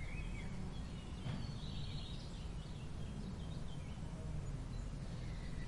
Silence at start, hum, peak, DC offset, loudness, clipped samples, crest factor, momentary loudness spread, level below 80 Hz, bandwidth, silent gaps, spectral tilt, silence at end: 0 s; none; -32 dBFS; under 0.1%; -47 LUFS; under 0.1%; 12 dB; 3 LU; -48 dBFS; 11.5 kHz; none; -6 dB/octave; 0 s